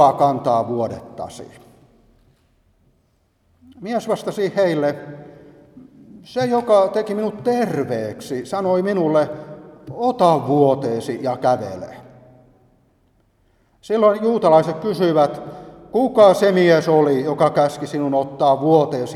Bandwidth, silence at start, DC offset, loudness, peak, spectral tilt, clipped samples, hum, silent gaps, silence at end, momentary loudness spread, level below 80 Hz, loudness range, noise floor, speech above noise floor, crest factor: 13.5 kHz; 0 s; under 0.1%; -18 LUFS; 0 dBFS; -6.5 dB/octave; under 0.1%; none; none; 0 s; 18 LU; -60 dBFS; 10 LU; -62 dBFS; 45 dB; 18 dB